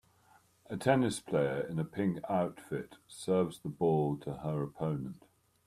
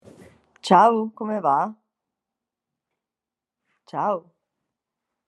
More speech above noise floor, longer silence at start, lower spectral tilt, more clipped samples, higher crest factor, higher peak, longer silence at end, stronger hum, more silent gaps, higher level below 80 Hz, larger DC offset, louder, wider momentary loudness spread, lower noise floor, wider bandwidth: second, 33 dB vs 69 dB; about the same, 0.7 s vs 0.65 s; about the same, -6.5 dB/octave vs -6 dB/octave; neither; about the same, 22 dB vs 24 dB; second, -14 dBFS vs -2 dBFS; second, 0.5 s vs 1.1 s; neither; neither; first, -66 dBFS vs -78 dBFS; neither; second, -34 LUFS vs -21 LUFS; second, 12 LU vs 15 LU; second, -66 dBFS vs -89 dBFS; first, 14.5 kHz vs 11.5 kHz